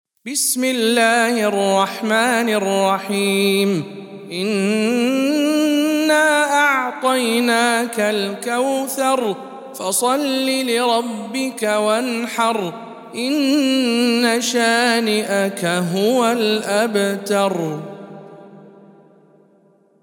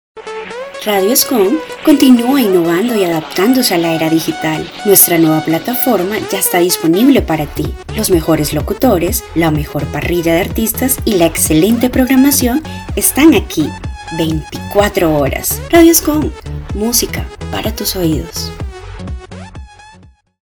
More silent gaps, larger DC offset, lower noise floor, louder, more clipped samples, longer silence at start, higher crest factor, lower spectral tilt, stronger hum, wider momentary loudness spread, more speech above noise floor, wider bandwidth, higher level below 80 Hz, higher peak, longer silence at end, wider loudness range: neither; neither; first, -55 dBFS vs -43 dBFS; second, -17 LUFS vs -12 LUFS; second, under 0.1% vs 0.5%; about the same, 0.25 s vs 0.15 s; first, 18 dB vs 12 dB; about the same, -3.5 dB/octave vs -4 dB/octave; neither; second, 9 LU vs 15 LU; first, 37 dB vs 31 dB; second, 17.5 kHz vs over 20 kHz; second, -78 dBFS vs -30 dBFS; about the same, -2 dBFS vs 0 dBFS; first, 1.35 s vs 0.55 s; about the same, 3 LU vs 3 LU